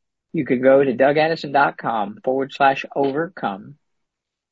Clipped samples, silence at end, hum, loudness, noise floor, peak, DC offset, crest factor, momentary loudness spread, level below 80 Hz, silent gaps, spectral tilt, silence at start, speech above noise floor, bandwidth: under 0.1%; 0.8 s; none; -19 LUFS; -80 dBFS; -2 dBFS; under 0.1%; 18 dB; 12 LU; -66 dBFS; none; -7 dB/octave; 0.35 s; 61 dB; 7.4 kHz